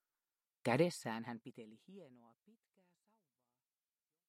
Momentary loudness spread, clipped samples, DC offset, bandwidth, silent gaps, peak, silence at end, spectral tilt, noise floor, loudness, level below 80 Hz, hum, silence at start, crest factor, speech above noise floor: 24 LU; under 0.1%; under 0.1%; 15.5 kHz; none; -20 dBFS; 2.2 s; -5.5 dB/octave; under -90 dBFS; -39 LUFS; -90 dBFS; none; 0.65 s; 26 dB; over 49 dB